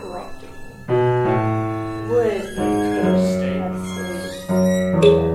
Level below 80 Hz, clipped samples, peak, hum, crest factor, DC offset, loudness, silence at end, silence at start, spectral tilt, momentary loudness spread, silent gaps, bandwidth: -42 dBFS; under 0.1%; 0 dBFS; none; 18 dB; under 0.1%; -20 LUFS; 0 s; 0 s; -7 dB/octave; 16 LU; none; 14 kHz